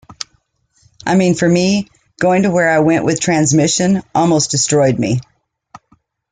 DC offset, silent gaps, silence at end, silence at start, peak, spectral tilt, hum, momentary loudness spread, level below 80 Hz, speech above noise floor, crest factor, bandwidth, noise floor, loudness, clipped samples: under 0.1%; none; 1.1 s; 0.1 s; -2 dBFS; -4.5 dB/octave; none; 11 LU; -50 dBFS; 47 dB; 14 dB; 9.6 kHz; -60 dBFS; -14 LUFS; under 0.1%